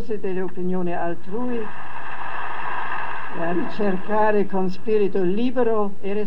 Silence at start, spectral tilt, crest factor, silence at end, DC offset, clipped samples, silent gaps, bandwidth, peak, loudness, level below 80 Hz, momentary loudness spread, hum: 0 s; -8.5 dB/octave; 16 dB; 0 s; 10%; under 0.1%; none; 9 kHz; -6 dBFS; -25 LUFS; -62 dBFS; 10 LU; none